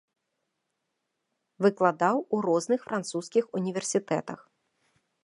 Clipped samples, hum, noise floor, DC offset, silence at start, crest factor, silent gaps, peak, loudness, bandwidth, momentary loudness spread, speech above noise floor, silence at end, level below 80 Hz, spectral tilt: under 0.1%; none; -81 dBFS; under 0.1%; 1.6 s; 22 dB; none; -8 dBFS; -28 LUFS; 11.5 kHz; 8 LU; 54 dB; 0.9 s; -80 dBFS; -5 dB/octave